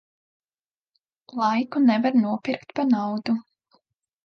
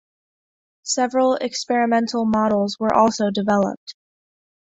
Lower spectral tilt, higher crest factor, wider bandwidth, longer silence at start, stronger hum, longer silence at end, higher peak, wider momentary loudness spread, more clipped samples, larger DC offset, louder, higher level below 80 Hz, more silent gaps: first, -7 dB/octave vs -4.5 dB/octave; about the same, 16 dB vs 18 dB; second, 6.6 kHz vs 8.2 kHz; first, 1.3 s vs 0.85 s; neither; about the same, 0.85 s vs 0.85 s; second, -10 dBFS vs -2 dBFS; about the same, 9 LU vs 8 LU; neither; neither; second, -23 LUFS vs -20 LUFS; second, -74 dBFS vs -58 dBFS; second, none vs 3.77-3.87 s